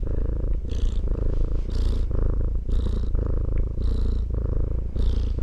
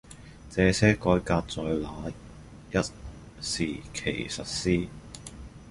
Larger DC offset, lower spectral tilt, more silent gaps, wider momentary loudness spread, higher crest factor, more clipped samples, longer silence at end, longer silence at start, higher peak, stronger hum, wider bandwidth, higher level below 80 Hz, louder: neither; first, -8.5 dB/octave vs -5 dB/octave; neither; second, 2 LU vs 23 LU; second, 12 dB vs 22 dB; neither; about the same, 0 s vs 0 s; about the same, 0 s vs 0.05 s; second, -10 dBFS vs -6 dBFS; neither; second, 5.8 kHz vs 11.5 kHz; first, -24 dBFS vs -44 dBFS; about the same, -28 LUFS vs -28 LUFS